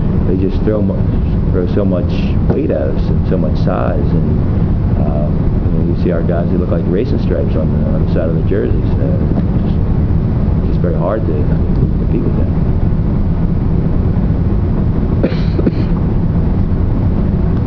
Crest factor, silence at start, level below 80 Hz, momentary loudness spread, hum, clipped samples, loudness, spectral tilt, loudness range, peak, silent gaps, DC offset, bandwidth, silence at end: 12 dB; 0 s; -18 dBFS; 1 LU; none; under 0.1%; -15 LUFS; -11 dB/octave; 0 LU; 0 dBFS; none; under 0.1%; 5.4 kHz; 0 s